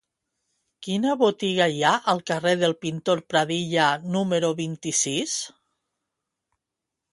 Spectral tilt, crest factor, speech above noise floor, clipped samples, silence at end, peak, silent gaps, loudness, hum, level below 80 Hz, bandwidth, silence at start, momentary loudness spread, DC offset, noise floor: -3.5 dB/octave; 20 dB; 62 dB; under 0.1%; 1.65 s; -4 dBFS; none; -23 LUFS; none; -68 dBFS; 11.5 kHz; 0.8 s; 7 LU; under 0.1%; -85 dBFS